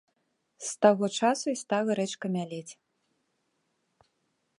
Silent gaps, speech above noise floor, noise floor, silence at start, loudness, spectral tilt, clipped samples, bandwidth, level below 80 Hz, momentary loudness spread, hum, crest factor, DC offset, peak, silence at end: none; 49 dB; -77 dBFS; 0.6 s; -28 LUFS; -4.5 dB/octave; under 0.1%; 11.5 kHz; -80 dBFS; 15 LU; none; 24 dB; under 0.1%; -6 dBFS; 1.85 s